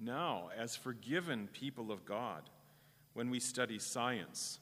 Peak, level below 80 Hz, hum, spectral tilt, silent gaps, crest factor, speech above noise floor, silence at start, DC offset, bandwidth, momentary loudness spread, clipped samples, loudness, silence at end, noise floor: -20 dBFS; -84 dBFS; none; -3.5 dB/octave; none; 22 dB; 25 dB; 0 s; under 0.1%; 15.5 kHz; 8 LU; under 0.1%; -41 LUFS; 0 s; -67 dBFS